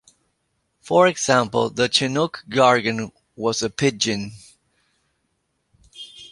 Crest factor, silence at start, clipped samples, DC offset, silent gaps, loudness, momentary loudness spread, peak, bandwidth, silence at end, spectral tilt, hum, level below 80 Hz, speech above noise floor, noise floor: 20 dB; 0.85 s; under 0.1%; under 0.1%; none; -20 LUFS; 18 LU; -2 dBFS; 11.5 kHz; 0.05 s; -3.5 dB/octave; none; -58 dBFS; 52 dB; -72 dBFS